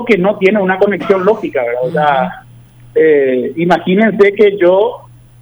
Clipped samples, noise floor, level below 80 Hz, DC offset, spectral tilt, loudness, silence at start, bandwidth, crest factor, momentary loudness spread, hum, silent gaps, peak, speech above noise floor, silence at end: under 0.1%; -38 dBFS; -50 dBFS; under 0.1%; -7.5 dB/octave; -12 LUFS; 0 s; over 20 kHz; 12 dB; 7 LU; none; none; 0 dBFS; 28 dB; 0.45 s